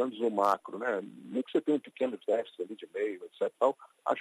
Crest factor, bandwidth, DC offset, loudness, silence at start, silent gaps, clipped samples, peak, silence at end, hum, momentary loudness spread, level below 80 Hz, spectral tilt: 20 dB; 13 kHz; under 0.1%; -32 LUFS; 0 s; none; under 0.1%; -12 dBFS; 0 s; none; 9 LU; -86 dBFS; -5.5 dB/octave